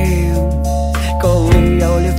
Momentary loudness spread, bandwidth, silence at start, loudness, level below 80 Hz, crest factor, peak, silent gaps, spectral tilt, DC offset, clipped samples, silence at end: 5 LU; 16 kHz; 0 s; -14 LUFS; -16 dBFS; 12 dB; 0 dBFS; none; -7 dB/octave; under 0.1%; under 0.1%; 0 s